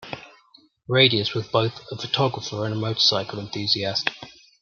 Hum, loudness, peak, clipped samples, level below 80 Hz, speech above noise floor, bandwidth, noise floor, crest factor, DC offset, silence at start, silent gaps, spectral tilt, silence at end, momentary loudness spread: none; -22 LUFS; -2 dBFS; under 0.1%; -64 dBFS; 34 dB; 7.2 kHz; -57 dBFS; 22 dB; under 0.1%; 0 s; none; -4.5 dB/octave; 0.3 s; 14 LU